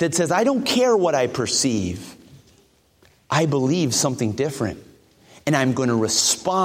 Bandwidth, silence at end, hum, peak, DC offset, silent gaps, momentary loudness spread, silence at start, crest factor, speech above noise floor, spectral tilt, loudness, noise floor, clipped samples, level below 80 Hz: 16.5 kHz; 0 s; none; -4 dBFS; under 0.1%; none; 11 LU; 0 s; 18 dB; 38 dB; -4 dB/octave; -20 LUFS; -58 dBFS; under 0.1%; -56 dBFS